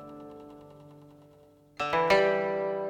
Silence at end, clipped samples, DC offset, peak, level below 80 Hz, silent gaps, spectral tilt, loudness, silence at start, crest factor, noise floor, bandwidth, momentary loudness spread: 0 s; under 0.1%; under 0.1%; -10 dBFS; -62 dBFS; none; -5 dB/octave; -26 LUFS; 0 s; 20 dB; -58 dBFS; 15 kHz; 24 LU